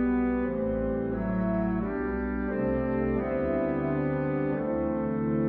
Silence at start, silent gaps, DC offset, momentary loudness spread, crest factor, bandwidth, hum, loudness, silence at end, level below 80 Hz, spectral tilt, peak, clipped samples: 0 s; none; under 0.1%; 2 LU; 12 dB; 4.4 kHz; none; -29 LUFS; 0 s; -42 dBFS; -12 dB/octave; -16 dBFS; under 0.1%